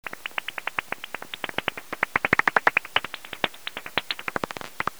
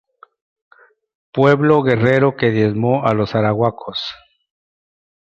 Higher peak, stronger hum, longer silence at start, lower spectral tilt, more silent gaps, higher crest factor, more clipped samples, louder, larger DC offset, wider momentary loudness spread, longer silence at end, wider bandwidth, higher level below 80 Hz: about the same, -2 dBFS vs -2 dBFS; neither; second, 0.05 s vs 1.35 s; second, -2.5 dB/octave vs -8 dB/octave; neither; first, 26 dB vs 16 dB; neither; second, -27 LUFS vs -16 LUFS; first, 0.5% vs under 0.1%; about the same, 13 LU vs 11 LU; second, 0.1 s vs 1.1 s; first, over 20 kHz vs 7.6 kHz; second, -58 dBFS vs -52 dBFS